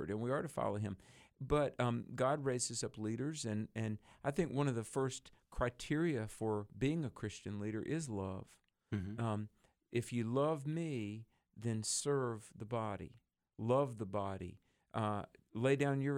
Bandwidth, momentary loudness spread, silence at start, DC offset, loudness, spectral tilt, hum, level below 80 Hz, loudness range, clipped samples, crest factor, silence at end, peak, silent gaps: 16 kHz; 10 LU; 0 s; under 0.1%; -39 LUFS; -5.5 dB/octave; none; -62 dBFS; 3 LU; under 0.1%; 20 dB; 0 s; -18 dBFS; none